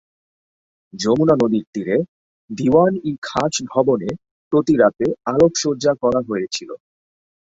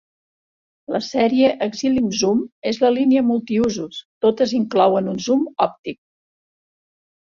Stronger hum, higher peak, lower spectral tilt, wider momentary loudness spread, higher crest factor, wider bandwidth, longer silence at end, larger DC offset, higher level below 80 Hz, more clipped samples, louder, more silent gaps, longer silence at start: neither; about the same, -2 dBFS vs -2 dBFS; about the same, -5.5 dB/octave vs -5 dB/octave; first, 13 LU vs 9 LU; about the same, 18 dB vs 18 dB; about the same, 8 kHz vs 7.4 kHz; second, 0.8 s vs 1.35 s; neither; about the same, -54 dBFS vs -56 dBFS; neither; about the same, -18 LUFS vs -19 LUFS; first, 1.67-1.73 s, 2.08-2.48 s, 3.18-3.22 s, 4.31-4.51 s vs 2.52-2.62 s, 4.05-4.21 s, 5.79-5.84 s; about the same, 0.95 s vs 0.9 s